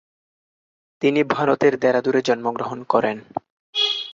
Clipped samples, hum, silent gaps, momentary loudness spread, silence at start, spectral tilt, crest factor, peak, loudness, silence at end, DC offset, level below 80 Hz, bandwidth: under 0.1%; none; 3.50-3.73 s; 11 LU; 1 s; -5 dB/octave; 20 dB; -2 dBFS; -20 LUFS; 0 s; under 0.1%; -66 dBFS; 7.6 kHz